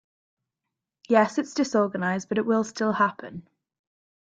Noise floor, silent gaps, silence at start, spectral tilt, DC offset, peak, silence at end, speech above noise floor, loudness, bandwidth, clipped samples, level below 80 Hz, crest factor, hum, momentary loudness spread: -86 dBFS; none; 1.1 s; -5.5 dB/octave; under 0.1%; -6 dBFS; 0.85 s; 61 dB; -24 LUFS; 9 kHz; under 0.1%; -70 dBFS; 22 dB; none; 12 LU